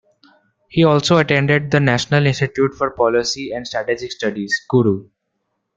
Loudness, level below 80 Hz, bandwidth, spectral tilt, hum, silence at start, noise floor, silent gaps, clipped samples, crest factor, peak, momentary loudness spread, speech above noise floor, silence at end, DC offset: -17 LUFS; -50 dBFS; 7.8 kHz; -5.5 dB/octave; none; 0.75 s; -73 dBFS; none; under 0.1%; 16 dB; -2 dBFS; 9 LU; 56 dB; 0.75 s; under 0.1%